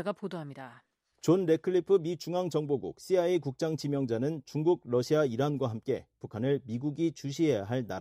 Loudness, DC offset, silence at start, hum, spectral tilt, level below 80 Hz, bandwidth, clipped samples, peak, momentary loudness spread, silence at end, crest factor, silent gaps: -31 LUFS; under 0.1%; 0 s; none; -7 dB/octave; -70 dBFS; 14.5 kHz; under 0.1%; -14 dBFS; 9 LU; 0 s; 16 dB; none